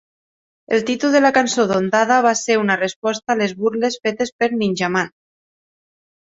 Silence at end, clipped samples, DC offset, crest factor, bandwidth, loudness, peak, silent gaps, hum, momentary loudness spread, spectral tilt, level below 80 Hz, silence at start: 1.3 s; under 0.1%; under 0.1%; 18 dB; 8 kHz; -18 LUFS; -2 dBFS; 2.96-3.02 s, 4.32-4.39 s; none; 7 LU; -4 dB/octave; -62 dBFS; 0.7 s